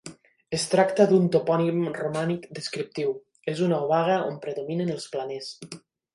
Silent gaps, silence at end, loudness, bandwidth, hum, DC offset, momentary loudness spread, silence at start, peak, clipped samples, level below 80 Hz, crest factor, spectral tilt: none; 0.35 s; -25 LUFS; 11.5 kHz; none; under 0.1%; 15 LU; 0.05 s; -6 dBFS; under 0.1%; -70 dBFS; 20 dB; -6 dB/octave